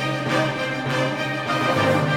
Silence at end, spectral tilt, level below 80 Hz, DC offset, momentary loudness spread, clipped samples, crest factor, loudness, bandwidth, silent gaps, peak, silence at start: 0 s; -5.5 dB/octave; -56 dBFS; under 0.1%; 5 LU; under 0.1%; 14 dB; -22 LUFS; 16.5 kHz; none; -8 dBFS; 0 s